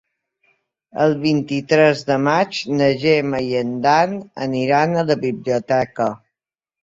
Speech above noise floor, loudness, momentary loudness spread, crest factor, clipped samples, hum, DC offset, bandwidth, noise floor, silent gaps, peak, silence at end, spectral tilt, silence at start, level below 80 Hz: 70 dB; -18 LUFS; 8 LU; 18 dB; under 0.1%; none; under 0.1%; 7.8 kHz; -88 dBFS; none; -2 dBFS; 0.65 s; -6 dB/octave; 0.95 s; -58 dBFS